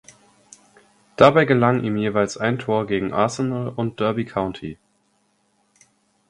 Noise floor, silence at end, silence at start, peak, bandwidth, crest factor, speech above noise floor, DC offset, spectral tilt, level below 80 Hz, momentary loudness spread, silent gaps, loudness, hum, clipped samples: -65 dBFS; 1.55 s; 1.2 s; 0 dBFS; 11.5 kHz; 22 dB; 46 dB; under 0.1%; -6.5 dB/octave; -54 dBFS; 12 LU; none; -20 LUFS; none; under 0.1%